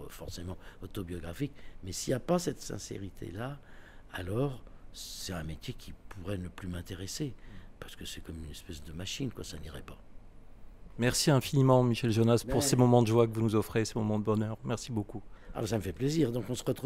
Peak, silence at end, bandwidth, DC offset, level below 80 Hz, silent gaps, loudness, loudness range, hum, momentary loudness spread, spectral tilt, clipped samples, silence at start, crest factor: -12 dBFS; 0 s; 16 kHz; under 0.1%; -50 dBFS; none; -31 LUFS; 15 LU; none; 19 LU; -5.5 dB/octave; under 0.1%; 0 s; 20 dB